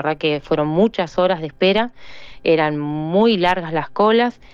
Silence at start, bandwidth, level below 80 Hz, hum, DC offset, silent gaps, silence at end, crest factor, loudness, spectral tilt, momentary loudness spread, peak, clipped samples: 0 s; 7.4 kHz; -48 dBFS; none; under 0.1%; none; 0.2 s; 12 dB; -18 LUFS; -7 dB/octave; 6 LU; -6 dBFS; under 0.1%